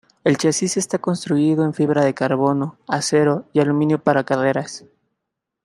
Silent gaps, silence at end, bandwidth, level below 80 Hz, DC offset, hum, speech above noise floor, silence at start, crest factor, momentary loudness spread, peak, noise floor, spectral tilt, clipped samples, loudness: none; 0.85 s; 12.5 kHz; -64 dBFS; under 0.1%; none; 62 dB; 0.25 s; 18 dB; 6 LU; -2 dBFS; -80 dBFS; -5.5 dB/octave; under 0.1%; -19 LUFS